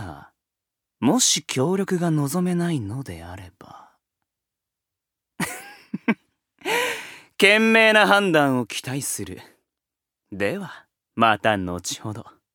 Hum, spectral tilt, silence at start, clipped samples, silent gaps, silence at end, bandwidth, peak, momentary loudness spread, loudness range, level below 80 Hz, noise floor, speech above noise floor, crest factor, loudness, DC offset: none; -3.5 dB/octave; 0 s; under 0.1%; none; 0.25 s; 20 kHz; 0 dBFS; 23 LU; 14 LU; -60 dBFS; -86 dBFS; 65 dB; 22 dB; -21 LUFS; under 0.1%